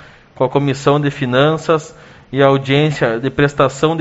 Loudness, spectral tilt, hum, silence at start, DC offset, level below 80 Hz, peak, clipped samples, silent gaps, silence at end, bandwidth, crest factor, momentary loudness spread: -15 LUFS; -5 dB/octave; none; 0.4 s; under 0.1%; -46 dBFS; 0 dBFS; under 0.1%; none; 0 s; 8 kHz; 16 dB; 4 LU